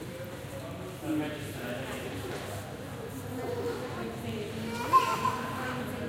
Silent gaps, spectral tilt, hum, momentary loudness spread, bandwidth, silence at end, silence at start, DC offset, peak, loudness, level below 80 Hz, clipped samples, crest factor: none; -5 dB/octave; none; 14 LU; 16.5 kHz; 0 s; 0 s; under 0.1%; -12 dBFS; -34 LUFS; -56 dBFS; under 0.1%; 22 dB